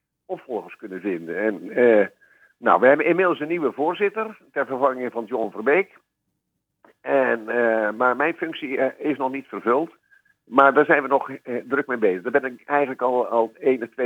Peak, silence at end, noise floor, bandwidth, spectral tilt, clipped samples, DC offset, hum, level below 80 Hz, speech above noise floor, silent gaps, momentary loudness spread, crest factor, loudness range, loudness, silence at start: 0 dBFS; 0 s; -77 dBFS; 7.6 kHz; -7 dB/octave; under 0.1%; under 0.1%; none; -84 dBFS; 56 dB; none; 13 LU; 22 dB; 4 LU; -22 LUFS; 0.3 s